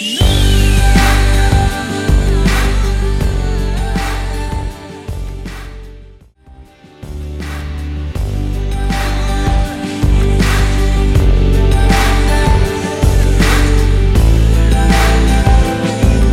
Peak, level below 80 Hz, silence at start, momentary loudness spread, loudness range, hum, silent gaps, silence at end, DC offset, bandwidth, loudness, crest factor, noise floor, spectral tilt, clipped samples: 0 dBFS; -14 dBFS; 0 s; 13 LU; 13 LU; none; none; 0 s; under 0.1%; 15 kHz; -14 LUFS; 12 dB; -40 dBFS; -5.5 dB/octave; under 0.1%